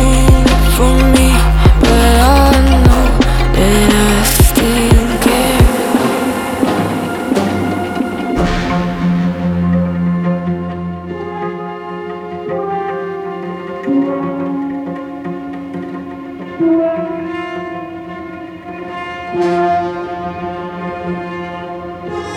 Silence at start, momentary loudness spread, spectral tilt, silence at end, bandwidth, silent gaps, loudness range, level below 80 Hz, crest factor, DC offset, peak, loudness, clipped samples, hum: 0 s; 15 LU; -5.5 dB/octave; 0 s; 17.5 kHz; none; 10 LU; -18 dBFS; 12 dB; under 0.1%; 0 dBFS; -14 LUFS; under 0.1%; none